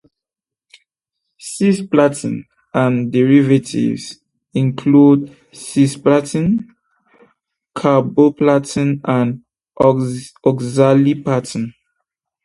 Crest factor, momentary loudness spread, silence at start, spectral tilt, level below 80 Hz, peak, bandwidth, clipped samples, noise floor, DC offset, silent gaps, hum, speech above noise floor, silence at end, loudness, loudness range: 16 dB; 14 LU; 1.45 s; -7 dB/octave; -54 dBFS; 0 dBFS; 11.5 kHz; under 0.1%; -87 dBFS; under 0.1%; none; none; 73 dB; 0.75 s; -15 LUFS; 2 LU